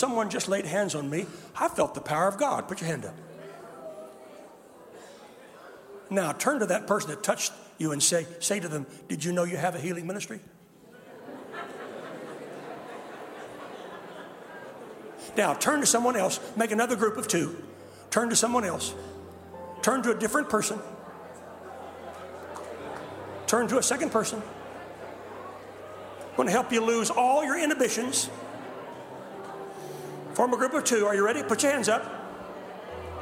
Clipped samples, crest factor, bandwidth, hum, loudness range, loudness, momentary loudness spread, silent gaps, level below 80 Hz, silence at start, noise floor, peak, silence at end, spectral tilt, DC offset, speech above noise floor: under 0.1%; 24 dB; 16 kHz; none; 13 LU; -27 LUFS; 20 LU; none; -66 dBFS; 0 s; -53 dBFS; -6 dBFS; 0 s; -3 dB/octave; under 0.1%; 26 dB